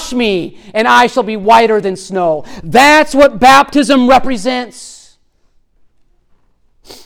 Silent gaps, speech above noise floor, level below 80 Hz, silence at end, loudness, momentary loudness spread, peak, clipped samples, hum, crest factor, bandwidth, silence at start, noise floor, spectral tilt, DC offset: none; 43 dB; -38 dBFS; 0.1 s; -10 LUFS; 13 LU; 0 dBFS; under 0.1%; none; 12 dB; 18 kHz; 0 s; -52 dBFS; -3.5 dB/octave; under 0.1%